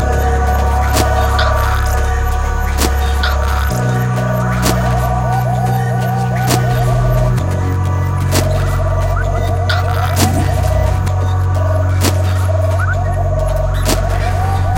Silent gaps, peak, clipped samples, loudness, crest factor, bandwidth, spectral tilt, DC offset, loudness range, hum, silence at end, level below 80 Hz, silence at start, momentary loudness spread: none; 0 dBFS; under 0.1%; -15 LUFS; 14 dB; 17 kHz; -5.5 dB/octave; under 0.1%; 1 LU; none; 0 s; -18 dBFS; 0 s; 3 LU